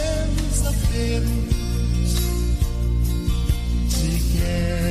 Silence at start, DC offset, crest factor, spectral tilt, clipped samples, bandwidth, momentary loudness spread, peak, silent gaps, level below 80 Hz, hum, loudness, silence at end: 0 s; under 0.1%; 14 dB; -5.5 dB/octave; under 0.1%; 15.5 kHz; 2 LU; -6 dBFS; none; -22 dBFS; none; -23 LUFS; 0 s